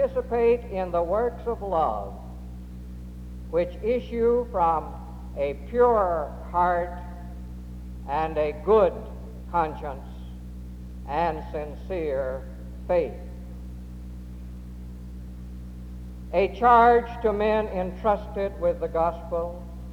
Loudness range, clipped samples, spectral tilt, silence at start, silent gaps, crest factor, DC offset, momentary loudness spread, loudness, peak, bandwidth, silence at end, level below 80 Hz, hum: 9 LU; under 0.1%; -8 dB/octave; 0 s; none; 18 dB; under 0.1%; 20 LU; -25 LUFS; -8 dBFS; 13.5 kHz; 0 s; -38 dBFS; 60 Hz at -65 dBFS